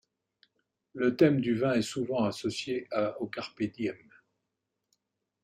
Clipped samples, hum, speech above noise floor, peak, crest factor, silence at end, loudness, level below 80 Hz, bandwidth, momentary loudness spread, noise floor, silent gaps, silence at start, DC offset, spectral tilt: under 0.1%; none; 55 dB; -10 dBFS; 22 dB; 1.45 s; -30 LUFS; -70 dBFS; 14 kHz; 12 LU; -84 dBFS; none; 0.95 s; under 0.1%; -6 dB/octave